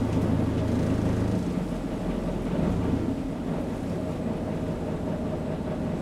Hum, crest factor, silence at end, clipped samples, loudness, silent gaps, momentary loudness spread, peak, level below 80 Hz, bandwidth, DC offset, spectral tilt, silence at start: none; 14 dB; 0 s; under 0.1%; -29 LUFS; none; 5 LU; -14 dBFS; -38 dBFS; 13.5 kHz; under 0.1%; -8 dB/octave; 0 s